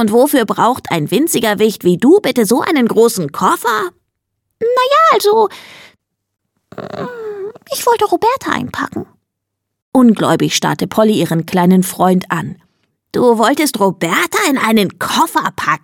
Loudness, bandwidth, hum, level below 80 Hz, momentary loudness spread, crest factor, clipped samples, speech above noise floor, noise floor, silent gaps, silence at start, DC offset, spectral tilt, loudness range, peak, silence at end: -13 LUFS; 17.5 kHz; none; -56 dBFS; 13 LU; 14 dB; under 0.1%; 63 dB; -75 dBFS; 9.82-9.92 s; 0 s; under 0.1%; -4.5 dB/octave; 6 LU; 0 dBFS; 0.05 s